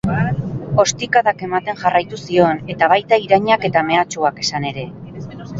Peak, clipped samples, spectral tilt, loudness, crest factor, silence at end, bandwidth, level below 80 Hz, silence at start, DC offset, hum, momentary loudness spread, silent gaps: 0 dBFS; under 0.1%; -4.5 dB/octave; -17 LUFS; 16 dB; 0 s; 7.8 kHz; -46 dBFS; 0.05 s; under 0.1%; none; 11 LU; none